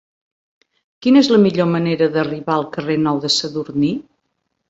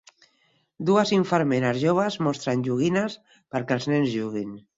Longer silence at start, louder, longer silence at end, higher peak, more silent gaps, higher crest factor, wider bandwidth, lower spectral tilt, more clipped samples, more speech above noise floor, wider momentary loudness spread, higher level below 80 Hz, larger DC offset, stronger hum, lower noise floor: first, 1 s vs 0.8 s; first, -17 LUFS vs -24 LUFS; first, 0.7 s vs 0.2 s; first, -2 dBFS vs -6 dBFS; neither; about the same, 16 dB vs 18 dB; about the same, 8 kHz vs 7.8 kHz; about the same, -5.5 dB/octave vs -6 dB/octave; neither; first, 56 dB vs 43 dB; about the same, 9 LU vs 10 LU; first, -58 dBFS vs -64 dBFS; neither; neither; first, -72 dBFS vs -67 dBFS